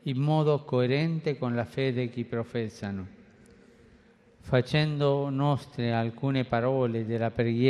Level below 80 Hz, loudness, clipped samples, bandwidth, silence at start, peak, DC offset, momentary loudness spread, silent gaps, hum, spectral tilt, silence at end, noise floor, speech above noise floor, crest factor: -58 dBFS; -28 LUFS; under 0.1%; 10.5 kHz; 0.05 s; -10 dBFS; under 0.1%; 8 LU; none; none; -8 dB/octave; 0 s; -58 dBFS; 31 dB; 18 dB